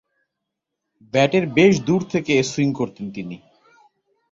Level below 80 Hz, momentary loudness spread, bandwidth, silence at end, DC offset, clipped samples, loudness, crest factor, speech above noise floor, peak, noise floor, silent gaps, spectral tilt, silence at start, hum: -56 dBFS; 17 LU; 7.8 kHz; 0.95 s; under 0.1%; under 0.1%; -19 LUFS; 20 dB; 62 dB; -2 dBFS; -81 dBFS; none; -5.5 dB/octave; 1.15 s; none